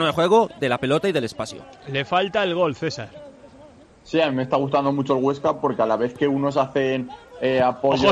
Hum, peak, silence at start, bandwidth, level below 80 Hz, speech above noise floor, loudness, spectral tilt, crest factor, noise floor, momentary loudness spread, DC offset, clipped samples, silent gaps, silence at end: none; -6 dBFS; 0 s; 12.5 kHz; -56 dBFS; 27 dB; -22 LUFS; -6 dB/octave; 16 dB; -48 dBFS; 10 LU; under 0.1%; under 0.1%; none; 0 s